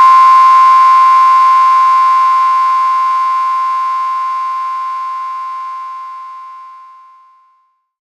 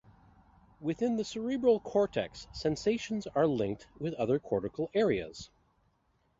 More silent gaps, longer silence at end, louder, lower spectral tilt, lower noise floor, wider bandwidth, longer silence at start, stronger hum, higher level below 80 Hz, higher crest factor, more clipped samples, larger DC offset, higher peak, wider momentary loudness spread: neither; first, 1.2 s vs 0.95 s; first, -9 LUFS vs -32 LUFS; second, 5 dB/octave vs -6 dB/octave; second, -57 dBFS vs -73 dBFS; first, 10.5 kHz vs 7.8 kHz; second, 0 s vs 0.8 s; neither; second, under -90 dBFS vs -60 dBFS; second, 10 dB vs 18 dB; neither; neither; first, 0 dBFS vs -14 dBFS; first, 19 LU vs 10 LU